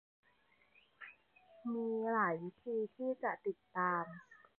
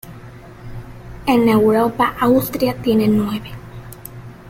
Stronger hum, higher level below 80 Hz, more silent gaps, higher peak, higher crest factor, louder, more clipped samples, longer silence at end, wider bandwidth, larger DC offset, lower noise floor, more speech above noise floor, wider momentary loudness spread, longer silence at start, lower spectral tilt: neither; second, -90 dBFS vs -42 dBFS; neither; second, -22 dBFS vs -2 dBFS; about the same, 18 dB vs 16 dB; second, -39 LUFS vs -16 LUFS; neither; first, 0.25 s vs 0 s; second, 4.1 kHz vs 16.5 kHz; neither; first, -73 dBFS vs -37 dBFS; first, 35 dB vs 22 dB; about the same, 20 LU vs 22 LU; first, 1 s vs 0.05 s; about the same, -6.5 dB/octave vs -6.5 dB/octave